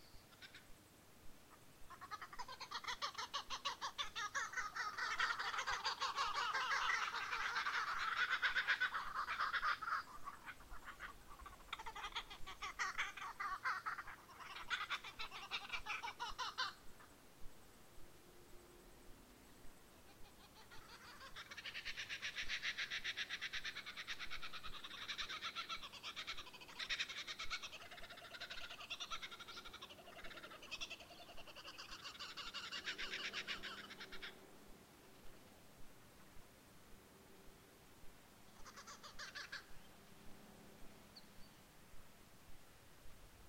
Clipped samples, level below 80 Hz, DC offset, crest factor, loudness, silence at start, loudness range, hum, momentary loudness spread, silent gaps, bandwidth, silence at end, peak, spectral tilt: under 0.1%; -66 dBFS; under 0.1%; 24 dB; -45 LUFS; 0 s; 22 LU; none; 24 LU; none; 16 kHz; 0 s; -24 dBFS; -0.5 dB/octave